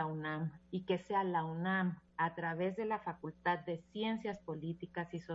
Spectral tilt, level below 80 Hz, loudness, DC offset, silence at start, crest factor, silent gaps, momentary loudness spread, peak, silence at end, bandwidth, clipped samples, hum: -5 dB/octave; -72 dBFS; -39 LUFS; under 0.1%; 0 s; 18 dB; none; 8 LU; -20 dBFS; 0 s; 7.6 kHz; under 0.1%; none